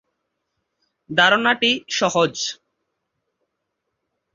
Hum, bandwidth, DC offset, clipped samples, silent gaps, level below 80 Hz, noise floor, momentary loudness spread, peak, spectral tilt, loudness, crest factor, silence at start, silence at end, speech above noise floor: none; 7.6 kHz; under 0.1%; under 0.1%; none; -64 dBFS; -77 dBFS; 10 LU; -2 dBFS; -2.5 dB/octave; -18 LUFS; 22 dB; 1.1 s; 1.8 s; 59 dB